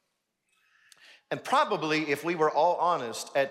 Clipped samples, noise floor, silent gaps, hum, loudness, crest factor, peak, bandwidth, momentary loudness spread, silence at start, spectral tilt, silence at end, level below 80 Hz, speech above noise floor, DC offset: under 0.1%; -79 dBFS; none; none; -27 LUFS; 18 dB; -12 dBFS; 16 kHz; 7 LU; 1.3 s; -4 dB/octave; 0 s; -86 dBFS; 52 dB; under 0.1%